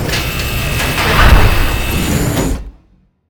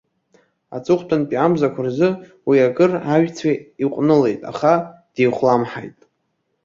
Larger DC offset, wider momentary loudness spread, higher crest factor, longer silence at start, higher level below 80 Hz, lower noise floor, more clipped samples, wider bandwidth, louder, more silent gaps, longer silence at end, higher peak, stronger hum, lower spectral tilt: neither; second, 8 LU vs 11 LU; about the same, 12 dB vs 16 dB; second, 0 s vs 0.7 s; first, -16 dBFS vs -60 dBFS; second, -51 dBFS vs -71 dBFS; first, 0.3% vs under 0.1%; first, over 20 kHz vs 7.6 kHz; first, -13 LUFS vs -18 LUFS; neither; second, 0.6 s vs 0.75 s; about the same, 0 dBFS vs -2 dBFS; neither; second, -4.5 dB/octave vs -7.5 dB/octave